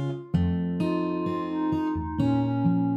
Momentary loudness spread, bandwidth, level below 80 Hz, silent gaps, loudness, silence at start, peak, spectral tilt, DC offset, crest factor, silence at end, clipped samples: 4 LU; 7.4 kHz; -46 dBFS; none; -27 LUFS; 0 s; -12 dBFS; -9.5 dB/octave; under 0.1%; 14 dB; 0 s; under 0.1%